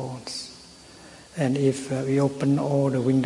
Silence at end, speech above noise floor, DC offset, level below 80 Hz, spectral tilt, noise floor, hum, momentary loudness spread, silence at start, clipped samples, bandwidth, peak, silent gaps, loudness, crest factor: 0 s; 25 dB; under 0.1%; -62 dBFS; -6.5 dB/octave; -47 dBFS; none; 22 LU; 0 s; under 0.1%; 11.5 kHz; -10 dBFS; none; -25 LUFS; 16 dB